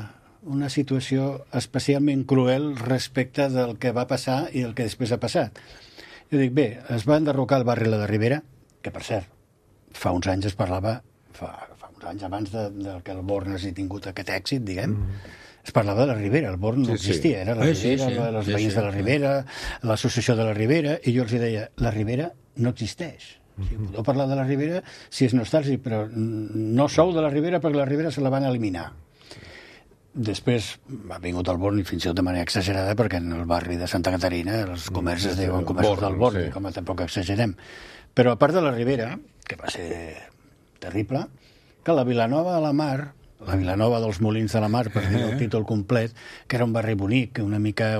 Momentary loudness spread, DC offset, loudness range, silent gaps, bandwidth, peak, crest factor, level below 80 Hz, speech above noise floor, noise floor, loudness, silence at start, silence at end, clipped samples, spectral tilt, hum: 14 LU; under 0.1%; 6 LU; none; 14.5 kHz; -2 dBFS; 22 dB; -46 dBFS; 35 dB; -59 dBFS; -24 LUFS; 0 s; 0 s; under 0.1%; -6.5 dB/octave; none